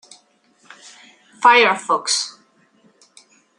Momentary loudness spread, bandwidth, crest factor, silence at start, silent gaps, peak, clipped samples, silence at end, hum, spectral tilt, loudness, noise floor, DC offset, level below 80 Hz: 9 LU; 11.5 kHz; 20 dB; 1.4 s; none; 0 dBFS; under 0.1%; 1.3 s; none; -0.5 dB/octave; -16 LUFS; -57 dBFS; under 0.1%; -82 dBFS